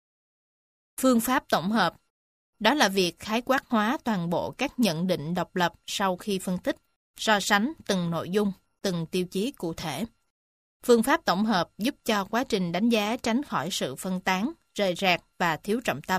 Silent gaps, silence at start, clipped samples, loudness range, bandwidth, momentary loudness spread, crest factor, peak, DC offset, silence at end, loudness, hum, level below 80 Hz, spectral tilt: 2.10-2.53 s, 6.96-7.14 s, 10.30-10.80 s; 1 s; under 0.1%; 3 LU; 15.5 kHz; 9 LU; 22 dB; -6 dBFS; under 0.1%; 0 s; -26 LUFS; none; -60 dBFS; -4.5 dB/octave